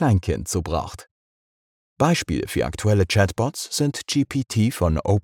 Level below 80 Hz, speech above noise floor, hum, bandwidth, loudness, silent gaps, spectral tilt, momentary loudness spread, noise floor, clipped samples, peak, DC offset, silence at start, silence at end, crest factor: -38 dBFS; over 69 dB; none; 17 kHz; -22 LUFS; 1.11-1.96 s; -5.5 dB/octave; 6 LU; under -90 dBFS; under 0.1%; -6 dBFS; under 0.1%; 0 s; 0.05 s; 16 dB